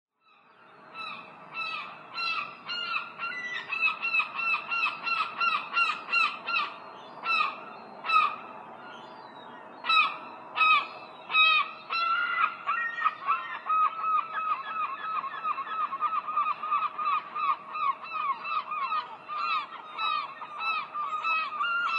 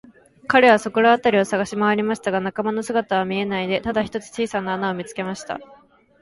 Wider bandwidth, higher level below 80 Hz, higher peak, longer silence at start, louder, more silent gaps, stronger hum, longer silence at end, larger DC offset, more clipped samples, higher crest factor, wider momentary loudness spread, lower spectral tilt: second, 9.8 kHz vs 11.5 kHz; second, under -90 dBFS vs -56 dBFS; second, -10 dBFS vs -2 dBFS; first, 0.7 s vs 0.5 s; second, -28 LUFS vs -20 LUFS; neither; neither; second, 0 s vs 0.45 s; neither; neither; about the same, 20 dB vs 18 dB; about the same, 15 LU vs 13 LU; second, -1.5 dB/octave vs -5 dB/octave